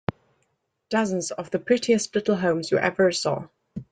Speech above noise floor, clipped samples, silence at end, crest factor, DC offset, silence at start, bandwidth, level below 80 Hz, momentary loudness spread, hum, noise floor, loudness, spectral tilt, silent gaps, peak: 50 dB; under 0.1%; 0.1 s; 20 dB; under 0.1%; 0.1 s; 9.4 kHz; -62 dBFS; 11 LU; none; -73 dBFS; -24 LUFS; -4.5 dB/octave; none; -6 dBFS